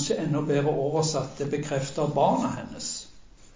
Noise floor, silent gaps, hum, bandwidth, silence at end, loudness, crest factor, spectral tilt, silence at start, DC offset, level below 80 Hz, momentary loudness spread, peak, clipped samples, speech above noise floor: -49 dBFS; none; none; 7.8 kHz; 0.35 s; -27 LUFS; 16 dB; -5.5 dB/octave; 0 s; under 0.1%; -56 dBFS; 9 LU; -10 dBFS; under 0.1%; 23 dB